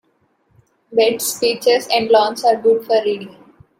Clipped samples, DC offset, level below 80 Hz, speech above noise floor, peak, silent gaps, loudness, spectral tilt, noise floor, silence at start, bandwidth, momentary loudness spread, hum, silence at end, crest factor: under 0.1%; under 0.1%; -64 dBFS; 46 dB; -2 dBFS; none; -16 LUFS; -2.5 dB/octave; -62 dBFS; 0.9 s; 16.5 kHz; 8 LU; none; 0.5 s; 16 dB